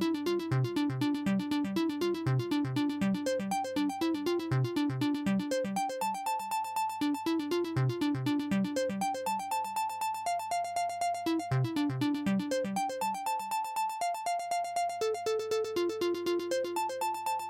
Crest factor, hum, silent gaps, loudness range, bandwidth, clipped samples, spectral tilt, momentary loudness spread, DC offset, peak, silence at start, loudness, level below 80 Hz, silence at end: 12 dB; none; none; 1 LU; 16.5 kHz; under 0.1%; -6 dB/octave; 3 LU; under 0.1%; -20 dBFS; 0 s; -32 LUFS; -68 dBFS; 0 s